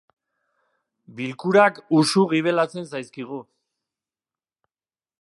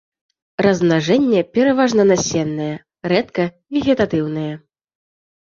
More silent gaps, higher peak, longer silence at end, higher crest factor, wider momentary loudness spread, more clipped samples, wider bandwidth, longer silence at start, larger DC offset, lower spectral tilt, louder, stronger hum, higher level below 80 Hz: neither; about the same, -2 dBFS vs 0 dBFS; first, 1.8 s vs 0.9 s; about the same, 22 dB vs 18 dB; first, 17 LU vs 12 LU; neither; first, 11.5 kHz vs 7.6 kHz; first, 1.1 s vs 0.6 s; neither; about the same, -5 dB/octave vs -5.5 dB/octave; second, -20 LUFS vs -17 LUFS; neither; second, -74 dBFS vs -52 dBFS